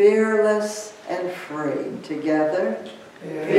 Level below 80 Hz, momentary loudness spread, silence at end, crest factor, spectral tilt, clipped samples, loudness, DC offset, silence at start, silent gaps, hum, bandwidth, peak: -76 dBFS; 14 LU; 0 s; 18 dB; -5 dB/octave; under 0.1%; -23 LUFS; under 0.1%; 0 s; none; none; 13 kHz; -4 dBFS